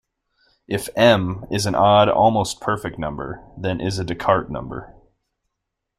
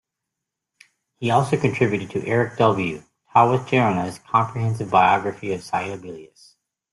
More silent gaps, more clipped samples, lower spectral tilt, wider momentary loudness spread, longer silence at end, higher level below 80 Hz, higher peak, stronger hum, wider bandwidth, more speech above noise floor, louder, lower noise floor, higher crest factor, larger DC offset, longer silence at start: neither; neither; second, -5 dB/octave vs -6.5 dB/octave; first, 16 LU vs 12 LU; first, 1.1 s vs 0.65 s; first, -46 dBFS vs -58 dBFS; about the same, -2 dBFS vs -2 dBFS; neither; first, 15.5 kHz vs 12 kHz; about the same, 60 dB vs 62 dB; about the same, -20 LUFS vs -21 LUFS; about the same, -80 dBFS vs -83 dBFS; about the same, 18 dB vs 20 dB; neither; second, 0.7 s vs 1.2 s